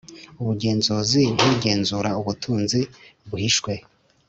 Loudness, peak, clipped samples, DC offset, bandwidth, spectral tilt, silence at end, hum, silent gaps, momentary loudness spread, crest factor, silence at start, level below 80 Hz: -22 LUFS; -4 dBFS; under 0.1%; under 0.1%; 8.2 kHz; -4.5 dB/octave; 0.5 s; none; none; 12 LU; 20 dB; 0.1 s; -54 dBFS